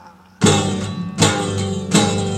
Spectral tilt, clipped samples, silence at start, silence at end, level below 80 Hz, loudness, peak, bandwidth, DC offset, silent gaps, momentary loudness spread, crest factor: -4.5 dB/octave; under 0.1%; 0.05 s; 0 s; -48 dBFS; -18 LUFS; 0 dBFS; 13.5 kHz; under 0.1%; none; 8 LU; 18 dB